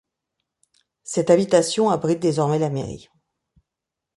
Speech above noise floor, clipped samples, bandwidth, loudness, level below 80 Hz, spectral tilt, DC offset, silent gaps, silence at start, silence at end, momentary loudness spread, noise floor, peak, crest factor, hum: 65 dB; under 0.1%; 11.5 kHz; -20 LUFS; -58 dBFS; -5.5 dB/octave; under 0.1%; none; 1.05 s; 1.2 s; 16 LU; -85 dBFS; -2 dBFS; 20 dB; none